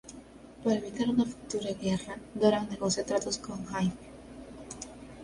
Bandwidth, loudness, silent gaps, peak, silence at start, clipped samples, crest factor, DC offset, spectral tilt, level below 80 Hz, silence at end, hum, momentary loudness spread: 11.5 kHz; -31 LUFS; none; -10 dBFS; 0.05 s; under 0.1%; 22 dB; under 0.1%; -5 dB/octave; -58 dBFS; 0 s; none; 20 LU